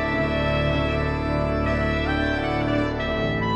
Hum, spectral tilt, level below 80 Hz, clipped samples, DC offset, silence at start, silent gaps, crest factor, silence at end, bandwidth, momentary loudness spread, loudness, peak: none; -7.5 dB/octave; -32 dBFS; under 0.1%; under 0.1%; 0 s; none; 14 dB; 0 s; 8.4 kHz; 2 LU; -23 LUFS; -10 dBFS